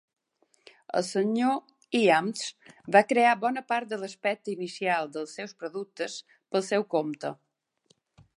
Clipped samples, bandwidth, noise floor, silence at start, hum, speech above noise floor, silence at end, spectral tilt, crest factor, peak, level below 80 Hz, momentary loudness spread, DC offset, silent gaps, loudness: under 0.1%; 11.5 kHz; -69 dBFS; 0.9 s; none; 42 dB; 1.05 s; -4.5 dB/octave; 22 dB; -6 dBFS; -80 dBFS; 14 LU; under 0.1%; none; -28 LUFS